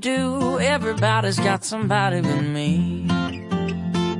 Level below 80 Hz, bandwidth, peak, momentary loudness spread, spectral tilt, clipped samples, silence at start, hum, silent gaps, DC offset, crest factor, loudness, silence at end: -54 dBFS; 11.5 kHz; -6 dBFS; 5 LU; -5.5 dB/octave; under 0.1%; 0 s; none; none; under 0.1%; 16 dB; -22 LUFS; 0 s